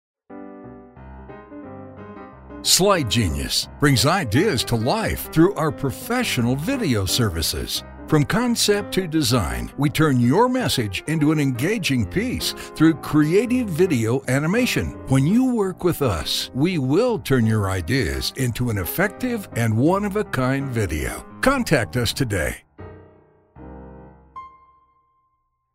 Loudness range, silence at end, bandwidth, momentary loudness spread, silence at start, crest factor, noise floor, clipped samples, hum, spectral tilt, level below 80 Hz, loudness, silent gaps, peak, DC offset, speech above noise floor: 4 LU; 1.25 s; 16 kHz; 20 LU; 0.3 s; 20 dB; -70 dBFS; under 0.1%; none; -5 dB/octave; -40 dBFS; -20 LUFS; none; 0 dBFS; under 0.1%; 50 dB